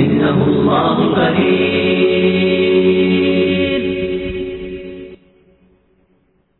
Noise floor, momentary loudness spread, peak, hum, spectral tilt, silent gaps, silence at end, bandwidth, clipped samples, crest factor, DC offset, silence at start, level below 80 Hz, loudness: -58 dBFS; 13 LU; -2 dBFS; none; -10 dB/octave; none; 1.45 s; 4.2 kHz; under 0.1%; 14 dB; under 0.1%; 0 s; -42 dBFS; -14 LUFS